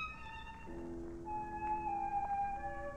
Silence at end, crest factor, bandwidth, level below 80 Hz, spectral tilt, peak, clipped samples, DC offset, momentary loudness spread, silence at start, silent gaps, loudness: 0 s; 12 dB; 9.4 kHz; -54 dBFS; -6.5 dB/octave; -28 dBFS; under 0.1%; under 0.1%; 11 LU; 0 s; none; -41 LUFS